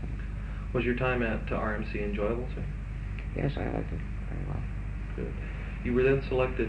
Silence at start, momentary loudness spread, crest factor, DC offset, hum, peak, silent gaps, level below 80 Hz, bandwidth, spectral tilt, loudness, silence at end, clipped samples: 0 s; 11 LU; 18 dB; under 0.1%; 50 Hz at -35 dBFS; -12 dBFS; none; -36 dBFS; 5.6 kHz; -8.5 dB/octave; -32 LUFS; 0 s; under 0.1%